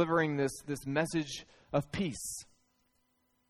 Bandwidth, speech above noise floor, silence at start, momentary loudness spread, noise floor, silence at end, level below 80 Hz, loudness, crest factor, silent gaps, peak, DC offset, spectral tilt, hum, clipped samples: 15 kHz; 42 dB; 0 s; 11 LU; -76 dBFS; 1.05 s; -62 dBFS; -35 LUFS; 18 dB; none; -16 dBFS; under 0.1%; -5 dB/octave; none; under 0.1%